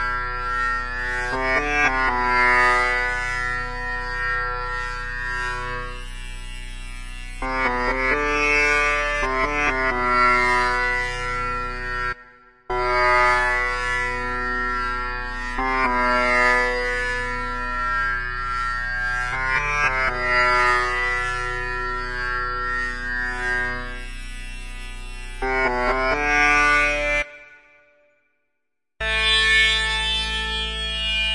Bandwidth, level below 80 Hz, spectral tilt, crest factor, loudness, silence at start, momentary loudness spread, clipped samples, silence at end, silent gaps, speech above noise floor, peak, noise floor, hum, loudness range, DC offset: 11.5 kHz; -34 dBFS; -3 dB/octave; 16 dB; -21 LUFS; 0 s; 14 LU; under 0.1%; 0 s; none; 61 dB; -6 dBFS; -81 dBFS; none; 6 LU; 0.2%